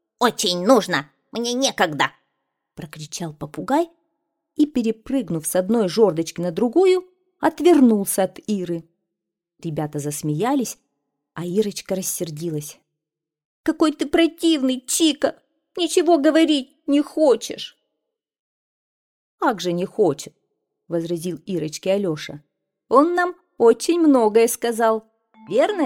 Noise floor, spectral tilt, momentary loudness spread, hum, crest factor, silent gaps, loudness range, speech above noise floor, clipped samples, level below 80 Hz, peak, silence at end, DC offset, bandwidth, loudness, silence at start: -85 dBFS; -4.5 dB/octave; 14 LU; none; 20 dB; 13.45-13.64 s, 18.40-19.38 s; 7 LU; 65 dB; under 0.1%; -62 dBFS; -2 dBFS; 0 s; under 0.1%; 17 kHz; -20 LUFS; 0.2 s